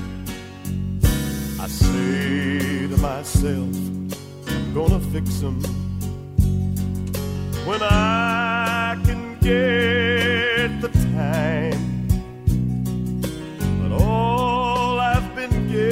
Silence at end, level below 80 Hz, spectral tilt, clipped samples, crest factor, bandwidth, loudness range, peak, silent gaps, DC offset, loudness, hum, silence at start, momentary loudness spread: 0 s; -30 dBFS; -6 dB/octave; under 0.1%; 18 dB; 16 kHz; 4 LU; -2 dBFS; none; under 0.1%; -21 LUFS; none; 0 s; 9 LU